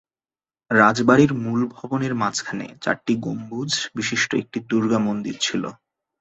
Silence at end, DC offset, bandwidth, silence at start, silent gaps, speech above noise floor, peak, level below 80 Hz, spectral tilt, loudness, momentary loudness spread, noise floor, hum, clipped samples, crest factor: 0.45 s; under 0.1%; 8.2 kHz; 0.7 s; none; over 69 dB; -2 dBFS; -60 dBFS; -4.5 dB/octave; -21 LUFS; 11 LU; under -90 dBFS; none; under 0.1%; 20 dB